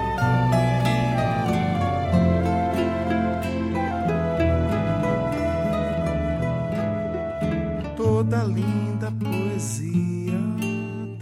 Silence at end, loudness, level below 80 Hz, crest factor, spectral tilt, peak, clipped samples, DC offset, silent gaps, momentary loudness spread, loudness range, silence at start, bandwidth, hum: 0 s; -24 LUFS; -38 dBFS; 14 dB; -7 dB/octave; -8 dBFS; under 0.1%; under 0.1%; none; 6 LU; 3 LU; 0 s; 15 kHz; none